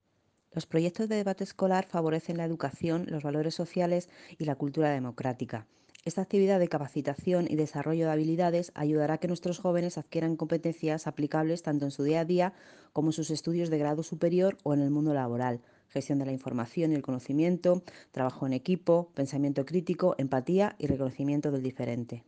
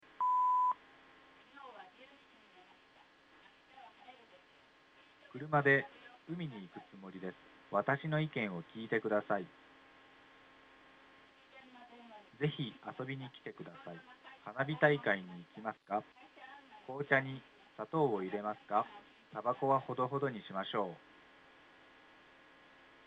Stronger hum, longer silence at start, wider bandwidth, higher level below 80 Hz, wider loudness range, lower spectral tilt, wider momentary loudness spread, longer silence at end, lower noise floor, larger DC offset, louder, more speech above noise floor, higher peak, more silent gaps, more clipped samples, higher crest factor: neither; first, 0.55 s vs 0.2 s; first, 9.4 kHz vs 8 kHz; first, -66 dBFS vs -80 dBFS; second, 2 LU vs 10 LU; about the same, -7 dB/octave vs -8 dB/octave; second, 7 LU vs 25 LU; second, 0.05 s vs 2.1 s; first, -73 dBFS vs -65 dBFS; neither; first, -30 LUFS vs -36 LUFS; first, 43 dB vs 28 dB; about the same, -12 dBFS vs -14 dBFS; neither; neither; second, 16 dB vs 26 dB